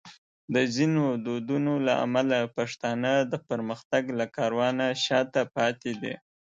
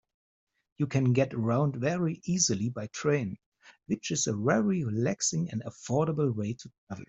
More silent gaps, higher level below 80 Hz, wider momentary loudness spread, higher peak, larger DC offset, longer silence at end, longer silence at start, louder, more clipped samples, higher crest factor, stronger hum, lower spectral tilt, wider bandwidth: first, 0.18-0.48 s, 3.85-3.90 s vs 3.46-3.52 s, 6.78-6.87 s; second, -72 dBFS vs -66 dBFS; about the same, 8 LU vs 10 LU; about the same, -10 dBFS vs -10 dBFS; neither; first, 0.35 s vs 0.05 s; second, 0.05 s vs 0.8 s; about the same, -27 LUFS vs -29 LUFS; neither; about the same, 18 dB vs 20 dB; neither; about the same, -5.5 dB/octave vs -5 dB/octave; about the same, 8.6 kHz vs 8.2 kHz